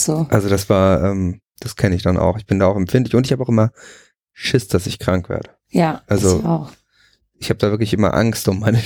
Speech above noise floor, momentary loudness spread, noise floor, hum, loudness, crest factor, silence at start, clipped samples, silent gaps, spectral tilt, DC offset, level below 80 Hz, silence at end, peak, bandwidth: 41 dB; 9 LU; -58 dBFS; none; -18 LUFS; 16 dB; 0 s; under 0.1%; none; -6 dB/octave; under 0.1%; -42 dBFS; 0 s; -2 dBFS; over 20 kHz